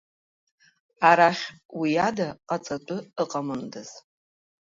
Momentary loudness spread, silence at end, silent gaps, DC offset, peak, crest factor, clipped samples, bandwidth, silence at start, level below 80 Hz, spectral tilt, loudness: 17 LU; 0.7 s; 1.65-1.69 s; under 0.1%; -4 dBFS; 22 dB; under 0.1%; 7.8 kHz; 1 s; -68 dBFS; -5 dB/octave; -25 LUFS